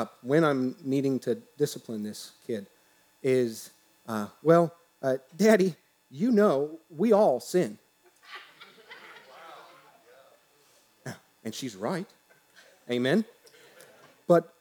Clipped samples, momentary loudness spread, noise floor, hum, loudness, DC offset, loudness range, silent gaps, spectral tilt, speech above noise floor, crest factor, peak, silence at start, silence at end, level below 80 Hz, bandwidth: under 0.1%; 24 LU; -63 dBFS; none; -27 LUFS; under 0.1%; 14 LU; none; -6 dB/octave; 37 dB; 22 dB; -8 dBFS; 0 s; 0.2 s; -90 dBFS; over 20 kHz